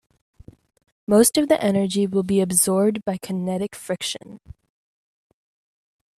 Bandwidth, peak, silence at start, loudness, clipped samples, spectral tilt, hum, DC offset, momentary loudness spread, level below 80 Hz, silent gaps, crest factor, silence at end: 15 kHz; -4 dBFS; 1.1 s; -20 LUFS; under 0.1%; -4.5 dB/octave; none; under 0.1%; 12 LU; -58 dBFS; none; 20 dB; 1.8 s